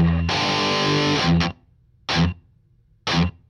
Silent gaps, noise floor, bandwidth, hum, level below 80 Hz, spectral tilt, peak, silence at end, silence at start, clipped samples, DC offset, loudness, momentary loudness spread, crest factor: none; -58 dBFS; 10 kHz; none; -36 dBFS; -5 dB/octave; -8 dBFS; 0.2 s; 0 s; under 0.1%; under 0.1%; -21 LUFS; 10 LU; 14 dB